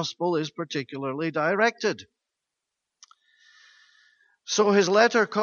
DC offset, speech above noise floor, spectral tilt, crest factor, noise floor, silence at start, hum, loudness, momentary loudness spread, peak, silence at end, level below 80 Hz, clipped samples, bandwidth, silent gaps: under 0.1%; 61 dB; -4 dB/octave; 22 dB; -85 dBFS; 0 s; none; -24 LUFS; 12 LU; -4 dBFS; 0 s; -76 dBFS; under 0.1%; 7.2 kHz; none